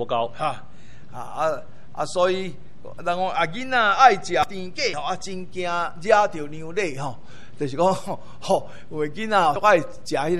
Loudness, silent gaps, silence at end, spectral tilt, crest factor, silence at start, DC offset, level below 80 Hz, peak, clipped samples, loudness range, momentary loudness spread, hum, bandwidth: -23 LUFS; none; 0 s; -4.5 dB/octave; 22 dB; 0 s; 3%; -56 dBFS; -2 dBFS; under 0.1%; 6 LU; 16 LU; none; 12.5 kHz